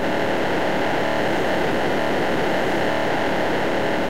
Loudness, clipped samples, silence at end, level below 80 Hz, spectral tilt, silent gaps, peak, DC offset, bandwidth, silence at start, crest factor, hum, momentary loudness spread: -21 LUFS; under 0.1%; 0 s; -46 dBFS; -5 dB/octave; none; -10 dBFS; 5%; 16 kHz; 0 s; 12 dB; none; 1 LU